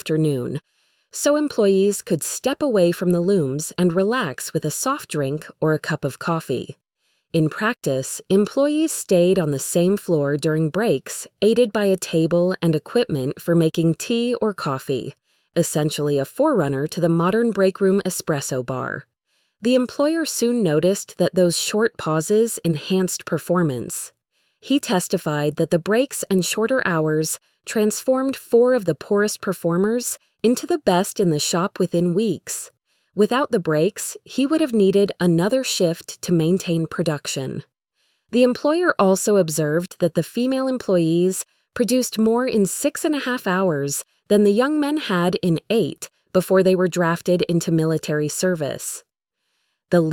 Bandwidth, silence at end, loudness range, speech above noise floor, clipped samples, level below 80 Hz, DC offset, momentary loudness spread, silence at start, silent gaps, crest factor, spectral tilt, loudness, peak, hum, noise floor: 19 kHz; 0 s; 3 LU; 56 dB; under 0.1%; -60 dBFS; under 0.1%; 8 LU; 0.05 s; none; 18 dB; -5 dB/octave; -20 LUFS; -4 dBFS; none; -76 dBFS